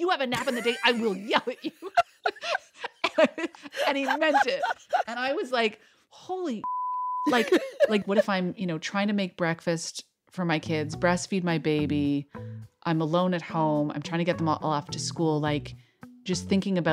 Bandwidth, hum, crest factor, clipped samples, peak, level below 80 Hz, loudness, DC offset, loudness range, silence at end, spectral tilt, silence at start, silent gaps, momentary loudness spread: 15.5 kHz; none; 20 dB; under 0.1%; -6 dBFS; -62 dBFS; -27 LUFS; under 0.1%; 2 LU; 0 s; -5 dB/octave; 0 s; none; 9 LU